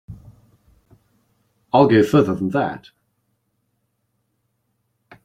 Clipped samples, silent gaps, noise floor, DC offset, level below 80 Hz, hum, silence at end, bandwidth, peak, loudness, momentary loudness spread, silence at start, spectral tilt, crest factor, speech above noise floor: under 0.1%; none; -71 dBFS; under 0.1%; -56 dBFS; none; 2.5 s; 14.5 kHz; -2 dBFS; -17 LUFS; 12 LU; 0.1 s; -7.5 dB/octave; 20 dB; 55 dB